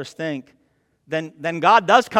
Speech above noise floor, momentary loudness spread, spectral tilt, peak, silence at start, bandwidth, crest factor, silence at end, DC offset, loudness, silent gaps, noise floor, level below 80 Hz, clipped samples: 45 dB; 14 LU; -4.5 dB/octave; 0 dBFS; 0 s; 15 kHz; 20 dB; 0 s; under 0.1%; -19 LUFS; none; -64 dBFS; -68 dBFS; under 0.1%